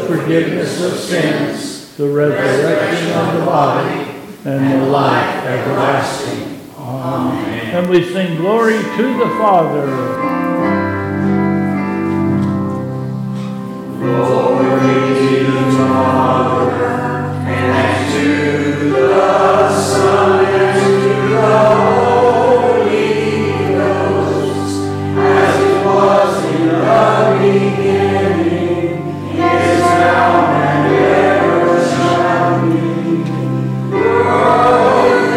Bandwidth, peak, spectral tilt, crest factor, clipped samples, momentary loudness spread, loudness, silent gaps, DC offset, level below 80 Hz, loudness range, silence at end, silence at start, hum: 16 kHz; 0 dBFS; -6.5 dB/octave; 12 dB; under 0.1%; 8 LU; -13 LUFS; none; under 0.1%; -54 dBFS; 5 LU; 0 s; 0 s; none